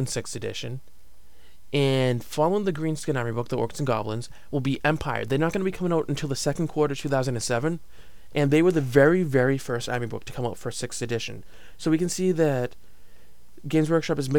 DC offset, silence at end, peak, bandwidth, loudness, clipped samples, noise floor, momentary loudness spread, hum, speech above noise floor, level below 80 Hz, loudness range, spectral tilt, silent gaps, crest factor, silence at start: 1%; 0 s; -4 dBFS; 17.5 kHz; -25 LUFS; under 0.1%; -55 dBFS; 12 LU; none; 30 dB; -50 dBFS; 4 LU; -5.5 dB/octave; none; 22 dB; 0 s